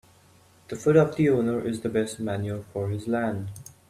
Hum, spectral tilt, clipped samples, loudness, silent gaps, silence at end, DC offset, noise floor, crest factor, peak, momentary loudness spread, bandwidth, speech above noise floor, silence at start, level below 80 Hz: none; -7 dB/octave; under 0.1%; -26 LUFS; none; 0.3 s; under 0.1%; -57 dBFS; 20 dB; -6 dBFS; 11 LU; 15 kHz; 32 dB; 0.7 s; -60 dBFS